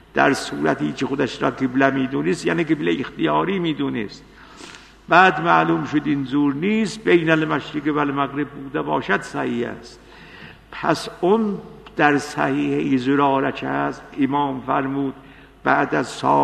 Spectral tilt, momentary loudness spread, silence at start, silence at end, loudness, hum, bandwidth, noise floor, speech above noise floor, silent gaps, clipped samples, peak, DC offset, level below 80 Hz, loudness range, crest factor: -6 dB/octave; 10 LU; 0.15 s; 0 s; -20 LUFS; none; 12 kHz; -42 dBFS; 22 dB; none; under 0.1%; 0 dBFS; under 0.1%; -52 dBFS; 5 LU; 20 dB